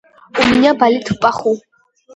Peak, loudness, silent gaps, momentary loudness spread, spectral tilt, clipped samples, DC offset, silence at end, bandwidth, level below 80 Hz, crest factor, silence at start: 0 dBFS; -14 LUFS; none; 10 LU; -5 dB/octave; under 0.1%; under 0.1%; 0.55 s; 10.5 kHz; -46 dBFS; 16 dB; 0.35 s